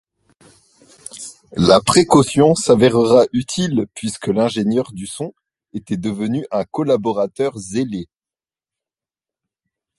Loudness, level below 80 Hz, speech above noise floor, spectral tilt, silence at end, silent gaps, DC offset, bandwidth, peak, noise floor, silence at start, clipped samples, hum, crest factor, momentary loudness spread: -17 LUFS; -48 dBFS; over 74 dB; -5.5 dB/octave; 1.95 s; none; under 0.1%; 12 kHz; 0 dBFS; under -90 dBFS; 1.15 s; under 0.1%; none; 18 dB; 18 LU